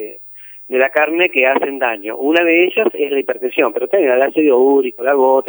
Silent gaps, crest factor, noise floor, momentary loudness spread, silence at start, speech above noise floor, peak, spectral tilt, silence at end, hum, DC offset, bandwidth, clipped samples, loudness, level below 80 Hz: none; 14 dB; -36 dBFS; 8 LU; 0 s; 22 dB; 0 dBFS; -5.5 dB/octave; 0 s; none; under 0.1%; over 20 kHz; under 0.1%; -14 LUFS; -70 dBFS